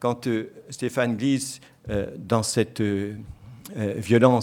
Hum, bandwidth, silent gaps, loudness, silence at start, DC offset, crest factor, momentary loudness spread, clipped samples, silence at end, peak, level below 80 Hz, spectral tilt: none; 17 kHz; none; -25 LUFS; 0 s; under 0.1%; 22 dB; 16 LU; under 0.1%; 0 s; -2 dBFS; -52 dBFS; -5.5 dB/octave